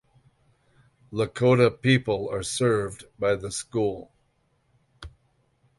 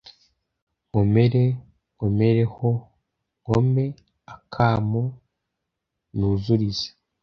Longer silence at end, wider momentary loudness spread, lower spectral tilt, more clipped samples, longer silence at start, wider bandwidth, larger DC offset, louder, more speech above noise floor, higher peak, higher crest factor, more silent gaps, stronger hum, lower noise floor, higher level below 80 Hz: first, 0.7 s vs 0.35 s; first, 24 LU vs 13 LU; second, -5.5 dB/octave vs -8.5 dB/octave; neither; first, 1.1 s vs 0.95 s; first, 11.5 kHz vs 6.8 kHz; neither; about the same, -25 LUFS vs -23 LUFS; second, 45 dB vs 61 dB; about the same, -6 dBFS vs -4 dBFS; about the same, 20 dB vs 18 dB; neither; neither; second, -69 dBFS vs -81 dBFS; second, -54 dBFS vs -46 dBFS